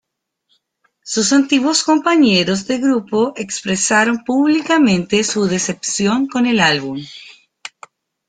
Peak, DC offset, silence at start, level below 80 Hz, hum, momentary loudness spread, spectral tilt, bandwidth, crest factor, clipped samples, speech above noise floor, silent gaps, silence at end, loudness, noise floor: -2 dBFS; under 0.1%; 1.05 s; -56 dBFS; none; 14 LU; -3.5 dB/octave; 9.6 kHz; 16 dB; under 0.1%; 54 dB; none; 0.6 s; -15 LUFS; -70 dBFS